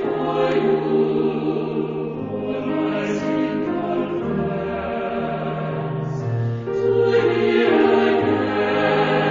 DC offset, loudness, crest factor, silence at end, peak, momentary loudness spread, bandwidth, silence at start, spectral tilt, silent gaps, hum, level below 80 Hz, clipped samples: under 0.1%; -21 LUFS; 16 dB; 0 s; -4 dBFS; 8 LU; 7.4 kHz; 0 s; -7.5 dB/octave; none; none; -52 dBFS; under 0.1%